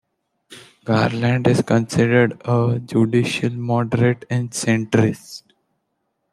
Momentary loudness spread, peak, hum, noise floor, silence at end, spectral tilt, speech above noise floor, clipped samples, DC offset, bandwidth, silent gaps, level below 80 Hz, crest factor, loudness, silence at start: 7 LU; -2 dBFS; none; -73 dBFS; 0.95 s; -6.5 dB/octave; 55 dB; under 0.1%; under 0.1%; 12.5 kHz; none; -56 dBFS; 18 dB; -19 LUFS; 0.5 s